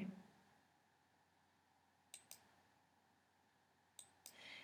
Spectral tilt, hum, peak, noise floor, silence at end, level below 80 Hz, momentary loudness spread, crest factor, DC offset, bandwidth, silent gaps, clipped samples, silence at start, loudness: -3.5 dB/octave; none; -36 dBFS; -78 dBFS; 0 s; under -90 dBFS; 8 LU; 24 dB; under 0.1%; 15.5 kHz; none; under 0.1%; 0 s; -60 LUFS